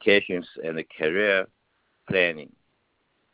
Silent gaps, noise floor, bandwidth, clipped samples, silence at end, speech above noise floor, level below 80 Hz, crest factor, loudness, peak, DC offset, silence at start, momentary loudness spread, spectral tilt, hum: none; -71 dBFS; 4 kHz; under 0.1%; 0.9 s; 47 dB; -64 dBFS; 20 dB; -24 LUFS; -6 dBFS; under 0.1%; 0 s; 11 LU; -8 dB/octave; none